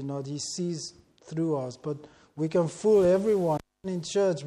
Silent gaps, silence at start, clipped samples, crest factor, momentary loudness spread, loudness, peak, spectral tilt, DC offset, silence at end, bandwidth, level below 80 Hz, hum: none; 0 s; under 0.1%; 16 dB; 15 LU; -28 LUFS; -12 dBFS; -6 dB/octave; under 0.1%; 0 s; 12.5 kHz; -62 dBFS; none